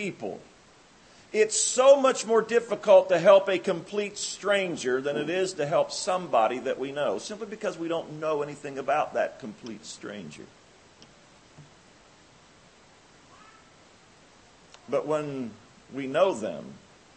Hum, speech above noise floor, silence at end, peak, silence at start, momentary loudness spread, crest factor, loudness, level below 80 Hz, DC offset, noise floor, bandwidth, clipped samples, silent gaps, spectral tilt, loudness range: none; 30 dB; 0.4 s; -6 dBFS; 0 s; 21 LU; 22 dB; -25 LUFS; -70 dBFS; under 0.1%; -56 dBFS; 8.8 kHz; under 0.1%; none; -3.5 dB/octave; 15 LU